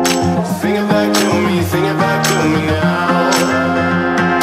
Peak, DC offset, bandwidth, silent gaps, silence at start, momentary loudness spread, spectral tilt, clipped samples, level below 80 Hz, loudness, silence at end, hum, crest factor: 0 dBFS; under 0.1%; 16 kHz; none; 0 s; 3 LU; -5 dB/octave; under 0.1%; -44 dBFS; -14 LUFS; 0 s; none; 14 dB